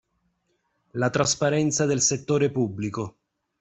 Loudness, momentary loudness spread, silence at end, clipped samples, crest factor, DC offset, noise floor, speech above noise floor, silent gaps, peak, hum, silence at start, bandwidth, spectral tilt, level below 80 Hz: -24 LUFS; 11 LU; 0.5 s; under 0.1%; 18 dB; under 0.1%; -73 dBFS; 49 dB; none; -8 dBFS; none; 0.95 s; 8.4 kHz; -4 dB/octave; -58 dBFS